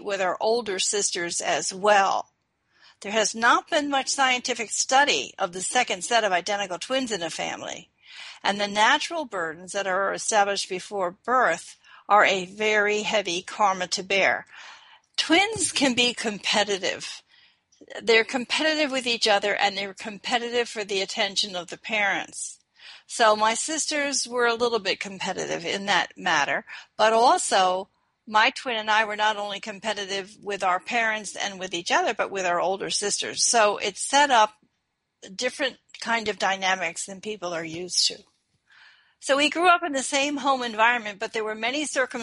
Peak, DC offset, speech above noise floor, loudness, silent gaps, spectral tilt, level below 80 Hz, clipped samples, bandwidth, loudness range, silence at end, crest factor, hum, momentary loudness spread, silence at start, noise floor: -4 dBFS; under 0.1%; 53 dB; -24 LUFS; none; -1.5 dB/octave; -70 dBFS; under 0.1%; 11.5 kHz; 4 LU; 0 s; 20 dB; none; 11 LU; 0 s; -77 dBFS